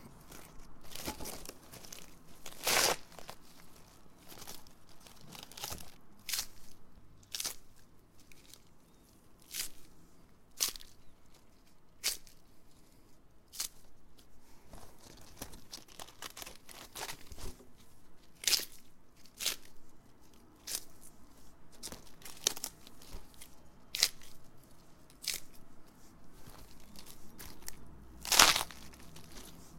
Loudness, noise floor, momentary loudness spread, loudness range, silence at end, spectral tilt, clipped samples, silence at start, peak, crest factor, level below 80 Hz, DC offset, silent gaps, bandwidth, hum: -34 LUFS; -60 dBFS; 26 LU; 12 LU; 0 s; 0 dB/octave; under 0.1%; 0 s; -2 dBFS; 40 dB; -60 dBFS; under 0.1%; none; 17 kHz; none